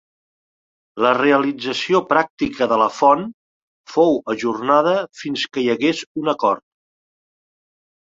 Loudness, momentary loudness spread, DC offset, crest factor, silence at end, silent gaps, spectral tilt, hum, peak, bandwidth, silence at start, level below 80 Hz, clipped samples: -18 LUFS; 8 LU; under 0.1%; 18 dB; 1.6 s; 2.30-2.37 s, 3.34-3.84 s, 6.06-6.15 s; -5 dB/octave; none; -2 dBFS; 7.8 kHz; 0.95 s; -60 dBFS; under 0.1%